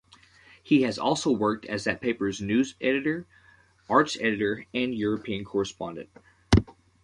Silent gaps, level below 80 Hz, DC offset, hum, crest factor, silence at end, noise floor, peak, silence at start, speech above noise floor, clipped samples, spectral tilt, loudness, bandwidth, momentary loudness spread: none; -44 dBFS; under 0.1%; none; 22 dB; 0.35 s; -56 dBFS; -6 dBFS; 0.65 s; 29 dB; under 0.1%; -5.5 dB/octave; -27 LUFS; 11 kHz; 8 LU